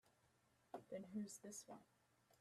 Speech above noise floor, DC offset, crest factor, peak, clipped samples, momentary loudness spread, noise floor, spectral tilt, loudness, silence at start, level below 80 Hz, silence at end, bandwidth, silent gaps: 25 dB; under 0.1%; 18 dB; -40 dBFS; under 0.1%; 10 LU; -80 dBFS; -4.5 dB/octave; -55 LUFS; 0.05 s; under -90 dBFS; 0.05 s; 14.5 kHz; none